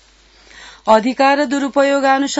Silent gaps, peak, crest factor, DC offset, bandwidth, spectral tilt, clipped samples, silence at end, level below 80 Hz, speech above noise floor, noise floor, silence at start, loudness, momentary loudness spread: none; 0 dBFS; 16 dB; under 0.1%; 8 kHz; -3.5 dB/octave; under 0.1%; 0 s; -54 dBFS; 35 dB; -48 dBFS; 0.6 s; -14 LUFS; 4 LU